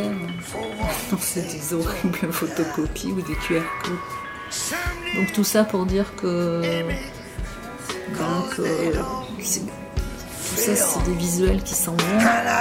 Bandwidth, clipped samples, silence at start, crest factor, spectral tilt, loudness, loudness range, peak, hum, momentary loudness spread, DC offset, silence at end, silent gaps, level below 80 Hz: 16.5 kHz; under 0.1%; 0 s; 18 dB; -4 dB/octave; -24 LUFS; 4 LU; -6 dBFS; none; 11 LU; under 0.1%; 0 s; none; -36 dBFS